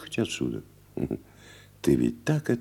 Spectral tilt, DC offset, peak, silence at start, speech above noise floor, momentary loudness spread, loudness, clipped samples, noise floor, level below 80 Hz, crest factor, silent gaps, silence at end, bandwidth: -6 dB/octave; under 0.1%; -10 dBFS; 0 s; 24 dB; 13 LU; -29 LUFS; under 0.1%; -51 dBFS; -52 dBFS; 20 dB; none; 0 s; 17.5 kHz